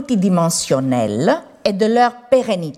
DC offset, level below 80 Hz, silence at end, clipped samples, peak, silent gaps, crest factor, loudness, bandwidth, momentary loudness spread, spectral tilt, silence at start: under 0.1%; -56 dBFS; 0.05 s; under 0.1%; -2 dBFS; none; 14 dB; -16 LUFS; 16 kHz; 4 LU; -5 dB/octave; 0 s